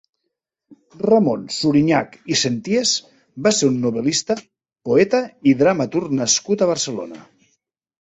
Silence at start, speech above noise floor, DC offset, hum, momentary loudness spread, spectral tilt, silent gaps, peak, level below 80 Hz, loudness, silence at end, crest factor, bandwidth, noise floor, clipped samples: 0.7 s; 60 dB; under 0.1%; none; 9 LU; -4 dB/octave; none; -2 dBFS; -58 dBFS; -18 LUFS; 0.8 s; 18 dB; 8.4 kHz; -78 dBFS; under 0.1%